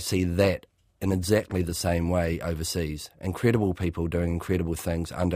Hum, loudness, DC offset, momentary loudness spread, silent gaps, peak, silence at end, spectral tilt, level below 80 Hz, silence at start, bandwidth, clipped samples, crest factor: none; -27 LUFS; under 0.1%; 7 LU; none; -8 dBFS; 0 s; -6 dB/octave; -42 dBFS; 0 s; 15.5 kHz; under 0.1%; 20 dB